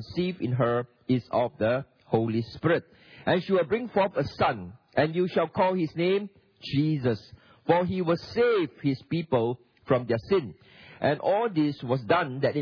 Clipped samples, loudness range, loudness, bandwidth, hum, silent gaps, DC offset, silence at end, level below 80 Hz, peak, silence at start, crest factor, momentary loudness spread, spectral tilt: under 0.1%; 1 LU; -27 LUFS; 5.4 kHz; none; none; under 0.1%; 0 s; -60 dBFS; -8 dBFS; 0 s; 20 dB; 6 LU; -8.5 dB/octave